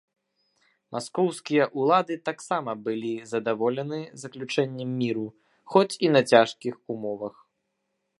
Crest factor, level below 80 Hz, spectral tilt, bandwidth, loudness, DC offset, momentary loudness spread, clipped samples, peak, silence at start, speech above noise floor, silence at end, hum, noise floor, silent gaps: 24 dB; -76 dBFS; -5.5 dB/octave; 11.5 kHz; -26 LUFS; under 0.1%; 15 LU; under 0.1%; -2 dBFS; 0.9 s; 53 dB; 0.9 s; none; -78 dBFS; none